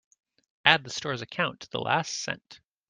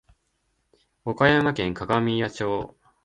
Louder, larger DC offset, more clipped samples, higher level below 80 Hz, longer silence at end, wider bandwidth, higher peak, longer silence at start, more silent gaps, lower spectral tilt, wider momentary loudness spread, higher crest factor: second, -27 LUFS vs -23 LUFS; neither; neither; second, -70 dBFS vs -52 dBFS; about the same, 0.35 s vs 0.4 s; about the same, 10.5 kHz vs 11 kHz; about the same, -2 dBFS vs -4 dBFS; second, 0.65 s vs 1.05 s; neither; second, -2.5 dB/octave vs -6.5 dB/octave; about the same, 12 LU vs 14 LU; first, 28 dB vs 22 dB